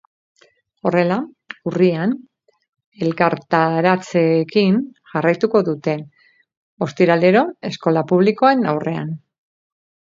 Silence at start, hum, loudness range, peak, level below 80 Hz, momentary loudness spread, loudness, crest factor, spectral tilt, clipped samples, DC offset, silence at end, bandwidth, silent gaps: 0.85 s; none; 2 LU; 0 dBFS; -64 dBFS; 12 LU; -18 LUFS; 18 dB; -7.5 dB/octave; under 0.1%; under 0.1%; 1 s; 7.6 kHz; 2.86-2.92 s, 6.57-6.77 s